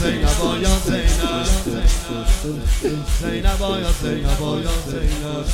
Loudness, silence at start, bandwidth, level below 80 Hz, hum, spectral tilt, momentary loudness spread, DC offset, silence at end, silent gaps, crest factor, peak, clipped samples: -21 LUFS; 0 s; 16.5 kHz; -20 dBFS; none; -4.5 dB/octave; 5 LU; under 0.1%; 0 s; none; 16 dB; -2 dBFS; under 0.1%